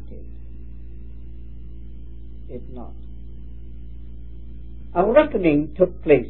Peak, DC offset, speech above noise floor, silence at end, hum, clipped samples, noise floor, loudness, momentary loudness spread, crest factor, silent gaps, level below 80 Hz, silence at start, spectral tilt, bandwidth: 0 dBFS; 2%; 19 dB; 0 s; none; under 0.1%; -38 dBFS; -19 LUFS; 24 LU; 24 dB; none; -38 dBFS; 0 s; -11.5 dB/octave; 4.2 kHz